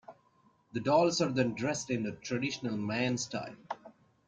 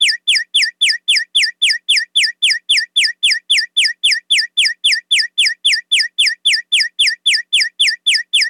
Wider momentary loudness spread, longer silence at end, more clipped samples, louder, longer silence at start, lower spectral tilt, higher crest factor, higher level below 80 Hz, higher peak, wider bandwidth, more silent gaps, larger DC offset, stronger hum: first, 15 LU vs 3 LU; first, 0.35 s vs 0 s; neither; second, -32 LUFS vs -12 LUFS; about the same, 0.1 s vs 0 s; first, -4.5 dB/octave vs 8.5 dB/octave; first, 20 dB vs 10 dB; first, -70 dBFS vs under -90 dBFS; second, -14 dBFS vs -4 dBFS; second, 9.4 kHz vs 17.5 kHz; neither; neither; neither